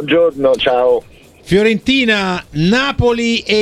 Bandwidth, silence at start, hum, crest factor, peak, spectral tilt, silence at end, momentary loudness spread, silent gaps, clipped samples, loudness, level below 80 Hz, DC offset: 12.5 kHz; 0 s; none; 14 dB; 0 dBFS; -5.5 dB/octave; 0 s; 4 LU; none; under 0.1%; -14 LUFS; -36 dBFS; under 0.1%